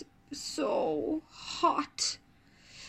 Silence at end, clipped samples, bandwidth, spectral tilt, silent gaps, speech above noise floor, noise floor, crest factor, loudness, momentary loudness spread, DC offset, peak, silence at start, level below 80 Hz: 0 s; under 0.1%; 15.5 kHz; -2.5 dB/octave; none; 30 dB; -61 dBFS; 20 dB; -32 LUFS; 11 LU; under 0.1%; -14 dBFS; 0 s; -66 dBFS